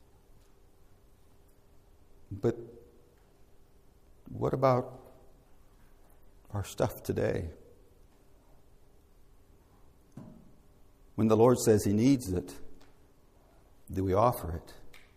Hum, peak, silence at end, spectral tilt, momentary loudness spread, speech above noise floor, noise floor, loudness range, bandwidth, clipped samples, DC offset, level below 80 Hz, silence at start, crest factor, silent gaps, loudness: none; -12 dBFS; 0.15 s; -6.5 dB/octave; 27 LU; 32 dB; -60 dBFS; 13 LU; 15.5 kHz; under 0.1%; under 0.1%; -56 dBFS; 2.3 s; 22 dB; none; -29 LUFS